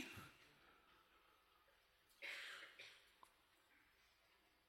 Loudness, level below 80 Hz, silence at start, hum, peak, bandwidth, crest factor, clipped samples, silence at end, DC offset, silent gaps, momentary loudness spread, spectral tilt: -56 LUFS; -88 dBFS; 0 s; none; -38 dBFS; 16.5 kHz; 24 dB; under 0.1%; 0 s; under 0.1%; none; 16 LU; -2 dB/octave